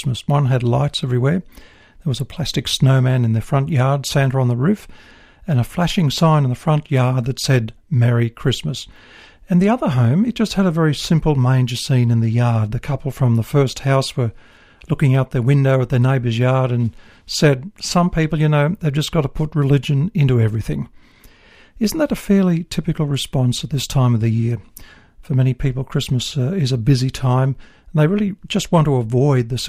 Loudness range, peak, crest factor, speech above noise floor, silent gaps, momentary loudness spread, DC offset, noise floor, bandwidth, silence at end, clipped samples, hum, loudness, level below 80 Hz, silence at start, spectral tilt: 2 LU; -2 dBFS; 14 dB; 30 dB; none; 7 LU; under 0.1%; -47 dBFS; 15 kHz; 0 s; under 0.1%; none; -18 LUFS; -40 dBFS; 0 s; -6.5 dB/octave